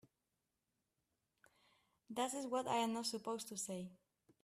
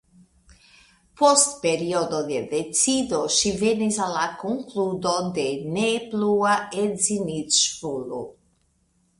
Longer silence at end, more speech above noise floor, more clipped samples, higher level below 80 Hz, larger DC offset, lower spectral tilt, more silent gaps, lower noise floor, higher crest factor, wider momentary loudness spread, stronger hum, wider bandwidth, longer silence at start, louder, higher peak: second, 0.5 s vs 0.9 s; first, 47 dB vs 43 dB; neither; second, -86 dBFS vs -58 dBFS; neither; about the same, -3 dB/octave vs -3 dB/octave; neither; first, -89 dBFS vs -66 dBFS; about the same, 20 dB vs 20 dB; about the same, 11 LU vs 9 LU; neither; first, 15.5 kHz vs 11.5 kHz; first, 2.1 s vs 1.15 s; second, -42 LUFS vs -22 LUFS; second, -26 dBFS vs -4 dBFS